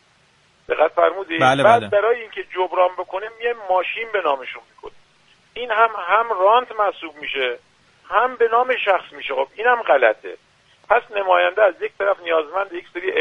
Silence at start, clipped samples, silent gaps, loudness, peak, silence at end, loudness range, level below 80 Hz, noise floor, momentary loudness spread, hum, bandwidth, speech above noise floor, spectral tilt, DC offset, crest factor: 0.7 s; under 0.1%; none; -19 LUFS; 0 dBFS; 0 s; 4 LU; -62 dBFS; -57 dBFS; 12 LU; none; 10.5 kHz; 38 dB; -5 dB/octave; under 0.1%; 20 dB